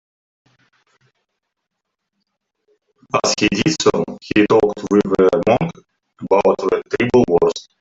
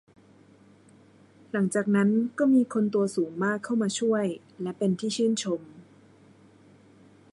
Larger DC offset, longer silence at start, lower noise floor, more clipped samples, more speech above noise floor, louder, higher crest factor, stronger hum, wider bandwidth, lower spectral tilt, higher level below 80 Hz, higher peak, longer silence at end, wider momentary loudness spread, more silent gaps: neither; first, 3.15 s vs 1.55 s; first, -78 dBFS vs -56 dBFS; neither; first, 62 dB vs 31 dB; first, -16 LUFS vs -26 LUFS; about the same, 18 dB vs 16 dB; neither; second, 8 kHz vs 11.5 kHz; about the same, -5 dB/octave vs -5.5 dB/octave; first, -50 dBFS vs -74 dBFS; first, 0 dBFS vs -12 dBFS; second, 0.2 s vs 1.5 s; second, 6 LU vs 10 LU; neither